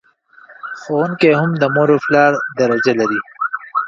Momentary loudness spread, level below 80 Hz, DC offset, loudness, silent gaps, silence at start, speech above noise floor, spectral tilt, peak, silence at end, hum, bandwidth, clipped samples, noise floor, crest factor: 10 LU; -60 dBFS; under 0.1%; -15 LUFS; none; 0.5 s; 32 dB; -6.5 dB/octave; 0 dBFS; 0 s; none; 7.6 kHz; under 0.1%; -46 dBFS; 16 dB